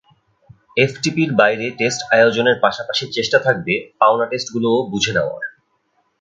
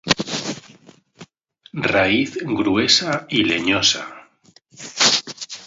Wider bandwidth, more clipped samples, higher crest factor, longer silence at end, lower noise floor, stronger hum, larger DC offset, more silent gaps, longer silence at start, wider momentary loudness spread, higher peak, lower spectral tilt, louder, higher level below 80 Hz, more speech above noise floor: first, 9.4 kHz vs 8 kHz; neither; about the same, 18 dB vs 22 dB; first, 0.7 s vs 0 s; first, -65 dBFS vs -54 dBFS; neither; neither; neither; first, 0.75 s vs 0.05 s; second, 8 LU vs 18 LU; about the same, 0 dBFS vs 0 dBFS; first, -4 dB/octave vs -2.5 dB/octave; about the same, -17 LUFS vs -18 LUFS; about the same, -56 dBFS vs -52 dBFS; first, 48 dB vs 35 dB